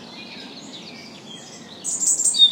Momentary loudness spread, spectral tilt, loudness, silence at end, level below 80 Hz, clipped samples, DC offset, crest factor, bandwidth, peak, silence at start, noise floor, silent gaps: 21 LU; 1 dB/octave; -18 LUFS; 0 s; -72 dBFS; under 0.1%; under 0.1%; 20 dB; 16.5 kHz; -4 dBFS; 0 s; -40 dBFS; none